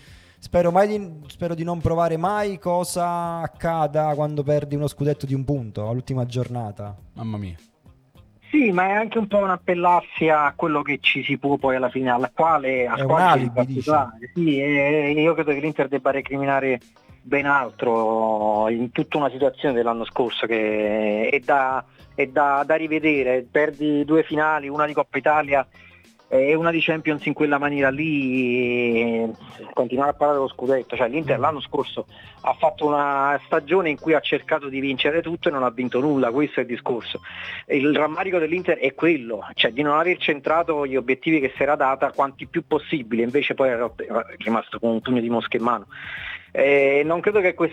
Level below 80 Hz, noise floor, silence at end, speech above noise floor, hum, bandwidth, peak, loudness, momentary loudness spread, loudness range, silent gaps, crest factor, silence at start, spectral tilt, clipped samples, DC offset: -54 dBFS; -53 dBFS; 0 s; 32 dB; none; 13.5 kHz; -4 dBFS; -21 LUFS; 8 LU; 4 LU; none; 18 dB; 0.1 s; -6.5 dB/octave; under 0.1%; under 0.1%